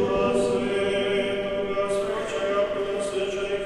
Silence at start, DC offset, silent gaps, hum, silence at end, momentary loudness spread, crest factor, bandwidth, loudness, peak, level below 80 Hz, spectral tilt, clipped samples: 0 s; under 0.1%; none; none; 0 s; 5 LU; 14 dB; 12 kHz; -25 LUFS; -12 dBFS; -48 dBFS; -4.5 dB/octave; under 0.1%